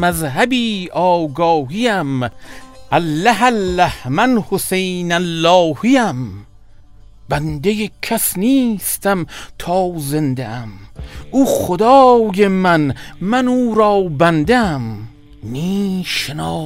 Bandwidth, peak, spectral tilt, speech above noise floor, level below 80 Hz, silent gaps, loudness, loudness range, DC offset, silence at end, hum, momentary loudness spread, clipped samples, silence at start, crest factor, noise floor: 16 kHz; 0 dBFS; -5 dB/octave; 26 dB; -40 dBFS; none; -15 LUFS; 5 LU; under 0.1%; 0 s; none; 12 LU; under 0.1%; 0 s; 16 dB; -41 dBFS